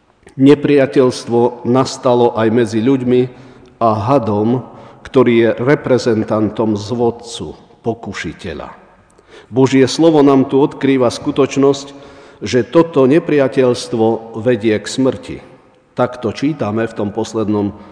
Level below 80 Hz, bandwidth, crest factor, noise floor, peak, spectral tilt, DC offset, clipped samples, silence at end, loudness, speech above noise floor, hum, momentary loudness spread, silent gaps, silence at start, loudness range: -50 dBFS; 10 kHz; 14 dB; -46 dBFS; 0 dBFS; -6.5 dB/octave; under 0.1%; 0.2%; 0 s; -14 LUFS; 33 dB; none; 14 LU; none; 0.35 s; 5 LU